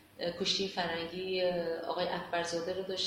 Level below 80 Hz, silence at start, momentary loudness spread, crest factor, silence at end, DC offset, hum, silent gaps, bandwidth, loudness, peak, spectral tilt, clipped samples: -66 dBFS; 0.15 s; 5 LU; 16 dB; 0 s; under 0.1%; none; none; 16.5 kHz; -34 LUFS; -18 dBFS; -3.5 dB/octave; under 0.1%